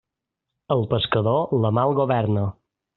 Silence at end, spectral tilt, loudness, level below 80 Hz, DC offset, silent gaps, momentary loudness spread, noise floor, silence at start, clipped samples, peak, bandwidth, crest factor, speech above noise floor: 0.45 s; -6 dB/octave; -22 LUFS; -54 dBFS; under 0.1%; none; 5 LU; -83 dBFS; 0.7 s; under 0.1%; -6 dBFS; 4.2 kHz; 16 dB; 63 dB